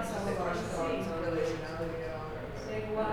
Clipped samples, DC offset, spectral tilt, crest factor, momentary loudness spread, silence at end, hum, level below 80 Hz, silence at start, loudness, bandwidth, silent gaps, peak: under 0.1%; under 0.1%; -6 dB/octave; 14 dB; 6 LU; 0 s; none; -50 dBFS; 0 s; -35 LUFS; 19.5 kHz; none; -20 dBFS